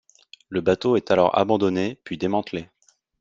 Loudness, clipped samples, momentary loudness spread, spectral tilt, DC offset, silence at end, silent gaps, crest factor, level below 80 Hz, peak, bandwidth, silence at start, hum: -22 LUFS; under 0.1%; 11 LU; -6.5 dB/octave; under 0.1%; 0.55 s; none; 20 dB; -60 dBFS; -4 dBFS; 7.6 kHz; 0.5 s; none